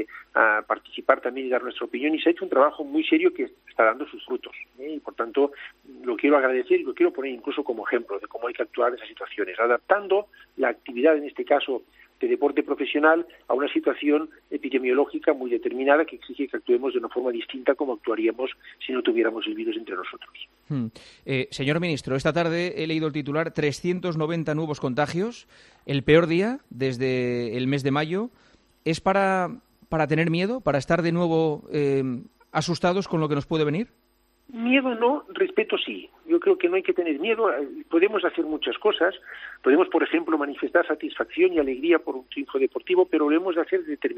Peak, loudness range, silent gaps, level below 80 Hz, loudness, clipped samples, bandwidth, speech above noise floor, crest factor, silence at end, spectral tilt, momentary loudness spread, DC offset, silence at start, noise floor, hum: -2 dBFS; 3 LU; none; -60 dBFS; -24 LUFS; under 0.1%; 10.5 kHz; 41 dB; 22 dB; 0 s; -6.5 dB/octave; 11 LU; under 0.1%; 0 s; -65 dBFS; none